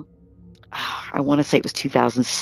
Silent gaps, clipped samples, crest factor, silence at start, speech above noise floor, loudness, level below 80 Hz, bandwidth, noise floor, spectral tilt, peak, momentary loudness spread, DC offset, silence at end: none; under 0.1%; 20 dB; 0 s; 29 dB; -21 LUFS; -56 dBFS; 14.5 kHz; -49 dBFS; -4.5 dB/octave; -2 dBFS; 10 LU; under 0.1%; 0 s